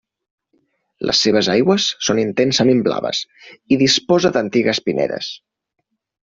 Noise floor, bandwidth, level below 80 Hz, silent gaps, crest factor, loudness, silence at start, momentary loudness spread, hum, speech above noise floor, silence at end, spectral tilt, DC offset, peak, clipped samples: -65 dBFS; 7.8 kHz; -56 dBFS; none; 16 dB; -16 LUFS; 1 s; 11 LU; none; 48 dB; 0.95 s; -4 dB/octave; under 0.1%; -2 dBFS; under 0.1%